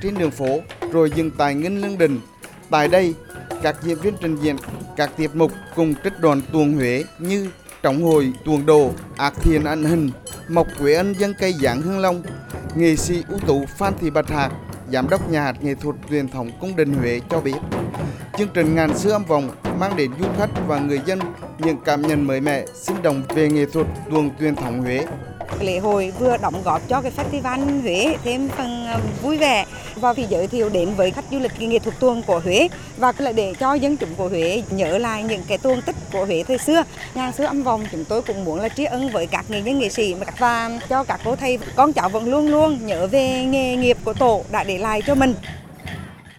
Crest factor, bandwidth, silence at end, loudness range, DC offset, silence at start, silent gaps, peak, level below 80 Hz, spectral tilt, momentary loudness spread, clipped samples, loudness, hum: 18 dB; 17.5 kHz; 0.05 s; 3 LU; under 0.1%; 0 s; none; -2 dBFS; -40 dBFS; -5.5 dB/octave; 8 LU; under 0.1%; -20 LUFS; none